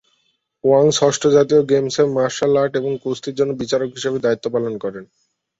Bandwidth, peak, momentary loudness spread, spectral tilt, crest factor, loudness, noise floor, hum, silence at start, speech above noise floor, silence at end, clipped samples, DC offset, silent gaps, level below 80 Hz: 8 kHz; -2 dBFS; 10 LU; -5 dB/octave; 16 dB; -18 LUFS; -66 dBFS; none; 0.65 s; 49 dB; 0.55 s; under 0.1%; under 0.1%; none; -58 dBFS